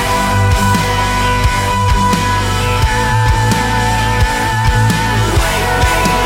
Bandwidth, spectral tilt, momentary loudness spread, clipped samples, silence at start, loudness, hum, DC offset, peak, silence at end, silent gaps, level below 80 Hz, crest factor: 16.5 kHz; -4.5 dB/octave; 2 LU; under 0.1%; 0 s; -13 LUFS; none; under 0.1%; -2 dBFS; 0 s; none; -20 dBFS; 10 dB